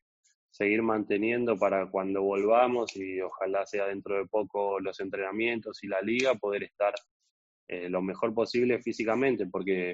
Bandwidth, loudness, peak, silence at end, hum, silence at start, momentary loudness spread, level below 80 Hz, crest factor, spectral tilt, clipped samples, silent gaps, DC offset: 7.8 kHz; -29 LUFS; -12 dBFS; 0 s; none; 0.6 s; 8 LU; -70 dBFS; 18 dB; -4 dB/octave; under 0.1%; 7.11-7.20 s, 7.31-7.67 s; under 0.1%